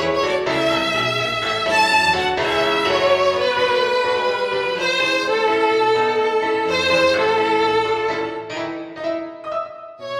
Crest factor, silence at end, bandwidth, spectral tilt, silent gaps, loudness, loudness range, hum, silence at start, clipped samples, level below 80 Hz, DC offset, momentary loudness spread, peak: 14 dB; 0 s; 14.5 kHz; -3.5 dB/octave; none; -18 LUFS; 2 LU; none; 0 s; under 0.1%; -52 dBFS; under 0.1%; 11 LU; -4 dBFS